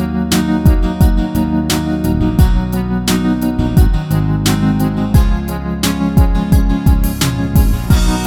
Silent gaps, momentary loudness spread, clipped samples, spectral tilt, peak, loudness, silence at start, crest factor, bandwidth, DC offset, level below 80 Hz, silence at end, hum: none; 3 LU; under 0.1%; -6 dB/octave; 0 dBFS; -14 LUFS; 0 s; 12 dB; 18.5 kHz; under 0.1%; -16 dBFS; 0 s; none